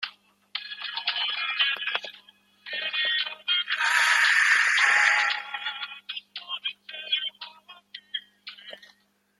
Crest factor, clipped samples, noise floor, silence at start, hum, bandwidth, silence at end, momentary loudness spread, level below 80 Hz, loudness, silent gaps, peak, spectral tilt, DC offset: 22 dB; under 0.1%; -63 dBFS; 0 s; 50 Hz at -70 dBFS; 16 kHz; 0.65 s; 23 LU; -88 dBFS; -24 LUFS; none; -6 dBFS; 3.5 dB/octave; under 0.1%